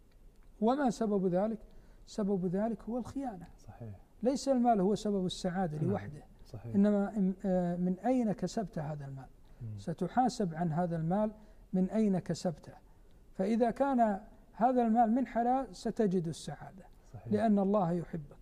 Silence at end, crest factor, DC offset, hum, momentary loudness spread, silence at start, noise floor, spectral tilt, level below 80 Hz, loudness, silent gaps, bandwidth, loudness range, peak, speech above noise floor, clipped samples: 0.05 s; 16 dB; under 0.1%; none; 18 LU; 0.25 s; -57 dBFS; -7.5 dB/octave; -58 dBFS; -33 LUFS; none; 11 kHz; 4 LU; -16 dBFS; 25 dB; under 0.1%